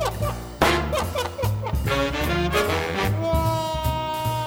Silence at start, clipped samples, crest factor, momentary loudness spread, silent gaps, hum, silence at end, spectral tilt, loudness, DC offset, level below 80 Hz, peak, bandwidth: 0 s; under 0.1%; 20 dB; 5 LU; none; none; 0 s; -5 dB/octave; -24 LUFS; under 0.1%; -32 dBFS; -2 dBFS; over 20 kHz